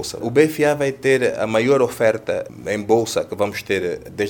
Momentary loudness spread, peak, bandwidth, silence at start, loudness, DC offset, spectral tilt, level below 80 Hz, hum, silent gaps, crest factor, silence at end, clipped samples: 9 LU; 0 dBFS; 19.5 kHz; 0 s; -19 LUFS; under 0.1%; -5 dB/octave; -56 dBFS; none; none; 18 dB; 0 s; under 0.1%